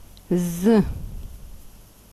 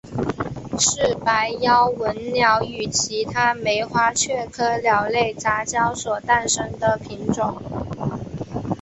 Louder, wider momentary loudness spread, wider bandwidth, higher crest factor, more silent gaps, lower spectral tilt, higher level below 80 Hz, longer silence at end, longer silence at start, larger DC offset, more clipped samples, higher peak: about the same, -22 LUFS vs -21 LUFS; first, 21 LU vs 10 LU; first, 13.5 kHz vs 8.4 kHz; about the same, 18 dB vs 18 dB; neither; first, -7 dB/octave vs -3 dB/octave; first, -38 dBFS vs -46 dBFS; first, 0.3 s vs 0 s; about the same, 0 s vs 0.05 s; neither; neither; about the same, -6 dBFS vs -4 dBFS